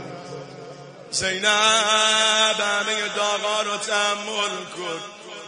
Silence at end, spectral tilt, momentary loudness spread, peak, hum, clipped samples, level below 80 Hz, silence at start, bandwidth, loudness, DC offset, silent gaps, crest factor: 0 s; -0.5 dB/octave; 21 LU; -4 dBFS; none; under 0.1%; -64 dBFS; 0 s; 10.5 kHz; -20 LUFS; under 0.1%; none; 20 dB